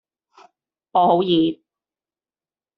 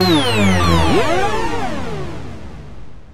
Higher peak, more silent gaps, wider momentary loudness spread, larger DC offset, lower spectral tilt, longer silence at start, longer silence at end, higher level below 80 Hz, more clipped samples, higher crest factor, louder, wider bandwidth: about the same, -4 dBFS vs -2 dBFS; neither; second, 9 LU vs 20 LU; second, under 0.1% vs 7%; about the same, -5 dB/octave vs -5 dB/octave; first, 0.95 s vs 0 s; first, 1.25 s vs 0 s; second, -66 dBFS vs -32 dBFS; neither; about the same, 18 dB vs 16 dB; second, -19 LUFS vs -16 LUFS; second, 5.2 kHz vs 16 kHz